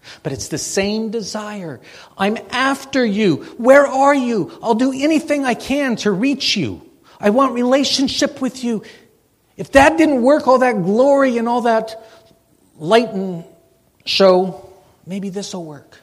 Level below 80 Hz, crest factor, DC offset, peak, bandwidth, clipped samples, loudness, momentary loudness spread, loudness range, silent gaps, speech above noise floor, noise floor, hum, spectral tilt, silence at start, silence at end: -48 dBFS; 16 dB; under 0.1%; 0 dBFS; 15 kHz; under 0.1%; -16 LUFS; 16 LU; 4 LU; none; 41 dB; -57 dBFS; none; -4.5 dB/octave; 0.05 s; 0.25 s